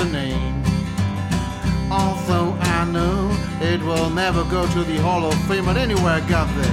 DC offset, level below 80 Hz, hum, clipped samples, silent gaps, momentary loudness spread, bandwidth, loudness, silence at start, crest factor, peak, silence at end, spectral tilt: under 0.1%; -30 dBFS; none; under 0.1%; none; 4 LU; 15.5 kHz; -20 LUFS; 0 s; 16 dB; -4 dBFS; 0 s; -6 dB/octave